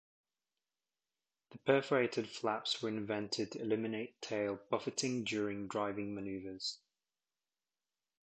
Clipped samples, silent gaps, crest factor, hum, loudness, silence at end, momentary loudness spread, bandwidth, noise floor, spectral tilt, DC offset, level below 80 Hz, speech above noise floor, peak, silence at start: under 0.1%; none; 22 dB; none; -38 LUFS; 1.45 s; 8 LU; 8.8 kHz; under -90 dBFS; -4 dB/octave; under 0.1%; -76 dBFS; over 53 dB; -18 dBFS; 1.5 s